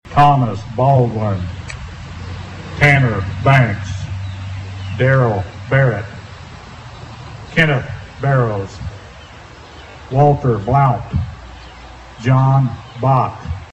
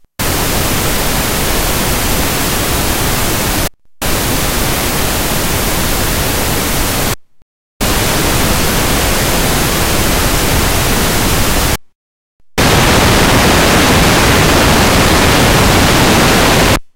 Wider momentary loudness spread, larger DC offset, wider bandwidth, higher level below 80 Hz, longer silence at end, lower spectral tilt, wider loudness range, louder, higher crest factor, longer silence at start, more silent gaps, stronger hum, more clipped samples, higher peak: first, 23 LU vs 6 LU; neither; second, 8.4 kHz vs 16 kHz; second, -38 dBFS vs -20 dBFS; about the same, 0.1 s vs 0.1 s; first, -7.5 dB/octave vs -3.5 dB/octave; about the same, 4 LU vs 5 LU; second, -16 LUFS vs -11 LUFS; about the same, 16 dB vs 12 dB; second, 0.05 s vs 0.2 s; second, none vs 7.42-7.80 s, 11.95-12.40 s; neither; neither; about the same, -2 dBFS vs 0 dBFS